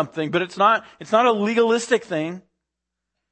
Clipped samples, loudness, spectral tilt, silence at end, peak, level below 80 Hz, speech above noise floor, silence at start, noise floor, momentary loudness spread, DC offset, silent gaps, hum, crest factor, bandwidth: under 0.1%; -20 LUFS; -4.5 dB/octave; 0.9 s; -4 dBFS; -72 dBFS; 62 dB; 0 s; -83 dBFS; 9 LU; under 0.1%; none; none; 18 dB; 8.8 kHz